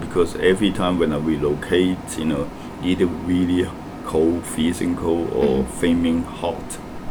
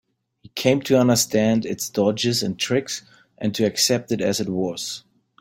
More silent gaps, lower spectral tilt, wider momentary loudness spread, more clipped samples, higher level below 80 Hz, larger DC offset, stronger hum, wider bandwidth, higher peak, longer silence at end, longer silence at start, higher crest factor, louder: neither; first, -6 dB/octave vs -4 dB/octave; second, 8 LU vs 12 LU; neither; first, -40 dBFS vs -60 dBFS; neither; neither; first, 19.5 kHz vs 17 kHz; about the same, -4 dBFS vs -2 dBFS; second, 0 s vs 0.4 s; second, 0 s vs 0.55 s; about the same, 18 dB vs 20 dB; about the same, -21 LUFS vs -21 LUFS